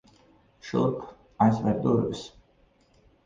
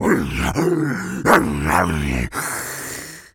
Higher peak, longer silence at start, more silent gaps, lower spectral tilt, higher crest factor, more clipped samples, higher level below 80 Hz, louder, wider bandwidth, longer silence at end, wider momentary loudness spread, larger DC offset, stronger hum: second, -8 dBFS vs 0 dBFS; first, 0.65 s vs 0 s; neither; first, -8 dB/octave vs -5 dB/octave; about the same, 20 dB vs 20 dB; neither; second, -56 dBFS vs -34 dBFS; second, -26 LUFS vs -20 LUFS; second, 7.6 kHz vs over 20 kHz; first, 1 s vs 0.1 s; first, 22 LU vs 11 LU; neither; neither